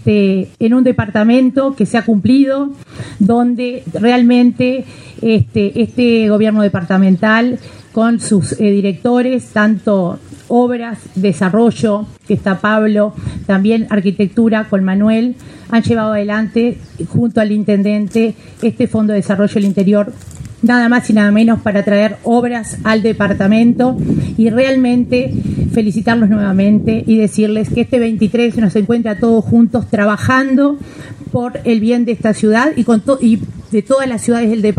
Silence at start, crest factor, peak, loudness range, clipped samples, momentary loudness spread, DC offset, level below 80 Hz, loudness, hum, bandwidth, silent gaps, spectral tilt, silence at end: 0 s; 12 dB; 0 dBFS; 2 LU; under 0.1%; 8 LU; under 0.1%; -42 dBFS; -13 LUFS; none; 11 kHz; none; -7 dB/octave; 0.05 s